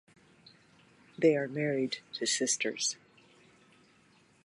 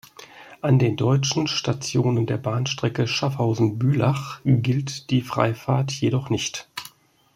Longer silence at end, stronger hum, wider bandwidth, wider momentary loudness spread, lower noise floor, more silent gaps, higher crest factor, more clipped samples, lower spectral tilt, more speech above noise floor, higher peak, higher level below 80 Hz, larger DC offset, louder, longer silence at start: first, 1.5 s vs 0.5 s; neither; second, 11.5 kHz vs 13.5 kHz; about the same, 7 LU vs 7 LU; first, -65 dBFS vs -49 dBFS; neither; about the same, 22 dB vs 20 dB; neither; second, -3 dB/octave vs -5.5 dB/octave; first, 34 dB vs 27 dB; second, -14 dBFS vs -4 dBFS; second, -82 dBFS vs -58 dBFS; neither; second, -31 LUFS vs -23 LUFS; first, 1.2 s vs 0.2 s